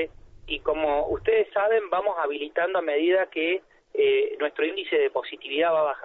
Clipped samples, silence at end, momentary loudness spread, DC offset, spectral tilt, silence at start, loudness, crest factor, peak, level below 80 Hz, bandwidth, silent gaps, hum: under 0.1%; 0 s; 7 LU; under 0.1%; -7 dB/octave; 0 s; -25 LUFS; 14 dB; -10 dBFS; -52 dBFS; 4.1 kHz; none; none